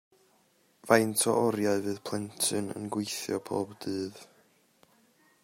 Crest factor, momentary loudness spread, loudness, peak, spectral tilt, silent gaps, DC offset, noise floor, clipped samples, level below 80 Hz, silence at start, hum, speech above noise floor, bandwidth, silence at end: 26 dB; 11 LU; -30 LUFS; -6 dBFS; -3.5 dB/octave; none; under 0.1%; -67 dBFS; under 0.1%; -74 dBFS; 0.85 s; none; 38 dB; 16 kHz; 1.2 s